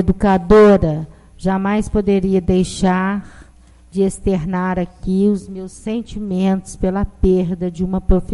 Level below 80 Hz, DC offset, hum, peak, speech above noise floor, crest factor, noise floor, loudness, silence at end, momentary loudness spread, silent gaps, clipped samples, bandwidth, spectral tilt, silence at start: -28 dBFS; under 0.1%; none; -2 dBFS; 29 dB; 14 dB; -45 dBFS; -17 LUFS; 0 s; 13 LU; none; under 0.1%; 11.5 kHz; -7.5 dB/octave; 0 s